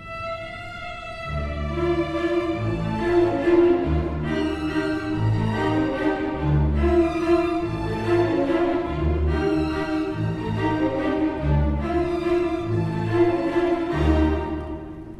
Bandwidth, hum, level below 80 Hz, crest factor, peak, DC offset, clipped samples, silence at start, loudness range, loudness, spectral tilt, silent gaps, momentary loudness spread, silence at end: 9.4 kHz; none; -32 dBFS; 16 dB; -8 dBFS; under 0.1%; under 0.1%; 0 s; 2 LU; -23 LUFS; -8 dB/octave; none; 9 LU; 0 s